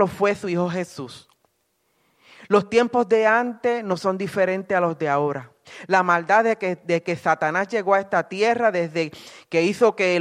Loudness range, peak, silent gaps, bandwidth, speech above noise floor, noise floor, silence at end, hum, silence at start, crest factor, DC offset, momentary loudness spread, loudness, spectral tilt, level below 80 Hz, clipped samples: 2 LU; -4 dBFS; none; 13.5 kHz; 48 dB; -70 dBFS; 0 s; none; 0 s; 18 dB; under 0.1%; 10 LU; -21 LUFS; -5.5 dB/octave; -66 dBFS; under 0.1%